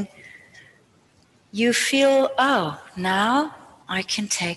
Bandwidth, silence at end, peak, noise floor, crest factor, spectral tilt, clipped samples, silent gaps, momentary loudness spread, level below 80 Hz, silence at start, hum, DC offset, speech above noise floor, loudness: 13 kHz; 0 s; -8 dBFS; -59 dBFS; 16 dB; -3 dB/octave; under 0.1%; none; 12 LU; -66 dBFS; 0 s; none; under 0.1%; 37 dB; -21 LUFS